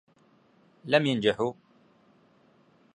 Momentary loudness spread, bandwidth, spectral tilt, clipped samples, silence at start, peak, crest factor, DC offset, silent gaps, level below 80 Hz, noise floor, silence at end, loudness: 10 LU; 10.5 kHz; -6 dB/octave; under 0.1%; 0.85 s; -6 dBFS; 26 dB; under 0.1%; none; -70 dBFS; -63 dBFS; 1.4 s; -26 LUFS